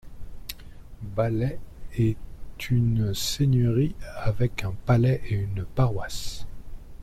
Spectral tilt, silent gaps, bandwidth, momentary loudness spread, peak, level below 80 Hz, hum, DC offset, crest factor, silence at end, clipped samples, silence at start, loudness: -6.5 dB/octave; none; 14.5 kHz; 19 LU; -8 dBFS; -40 dBFS; none; under 0.1%; 16 dB; 0 s; under 0.1%; 0.05 s; -26 LUFS